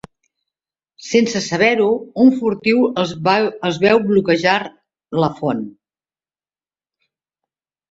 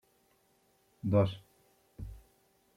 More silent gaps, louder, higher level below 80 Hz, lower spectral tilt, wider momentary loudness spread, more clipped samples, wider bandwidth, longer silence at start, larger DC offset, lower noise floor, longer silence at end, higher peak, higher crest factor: neither; first, -16 LUFS vs -31 LUFS; about the same, -58 dBFS vs -58 dBFS; second, -5.5 dB/octave vs -9 dB/octave; second, 9 LU vs 20 LU; neither; second, 7.8 kHz vs 10.5 kHz; about the same, 1 s vs 1.05 s; neither; first, under -90 dBFS vs -71 dBFS; first, 2.2 s vs 0.6 s; first, -2 dBFS vs -14 dBFS; about the same, 18 dB vs 22 dB